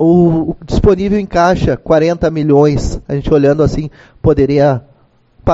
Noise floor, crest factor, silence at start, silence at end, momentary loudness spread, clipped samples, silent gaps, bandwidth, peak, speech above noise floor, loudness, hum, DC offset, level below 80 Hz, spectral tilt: -48 dBFS; 12 dB; 0 s; 0 s; 9 LU; under 0.1%; none; 8 kHz; 0 dBFS; 37 dB; -12 LUFS; none; under 0.1%; -26 dBFS; -8 dB/octave